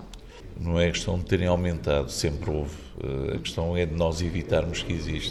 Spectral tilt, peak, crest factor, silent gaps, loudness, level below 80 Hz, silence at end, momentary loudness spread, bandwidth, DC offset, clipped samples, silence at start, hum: -5.5 dB/octave; -8 dBFS; 18 dB; none; -27 LUFS; -38 dBFS; 0 s; 11 LU; 13 kHz; under 0.1%; under 0.1%; 0 s; none